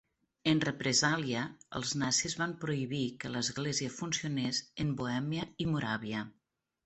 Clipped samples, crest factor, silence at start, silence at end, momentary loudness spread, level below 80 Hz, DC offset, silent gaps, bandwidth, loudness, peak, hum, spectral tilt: under 0.1%; 20 dB; 0.45 s; 0.55 s; 8 LU; -64 dBFS; under 0.1%; none; 8.4 kHz; -33 LUFS; -14 dBFS; none; -3.5 dB/octave